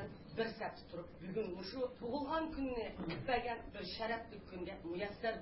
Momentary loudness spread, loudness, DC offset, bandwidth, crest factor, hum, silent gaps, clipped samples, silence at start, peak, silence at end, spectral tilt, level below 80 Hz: 9 LU; -43 LUFS; under 0.1%; 5.6 kHz; 18 dB; none; none; under 0.1%; 0 s; -24 dBFS; 0 s; -3.5 dB/octave; -60 dBFS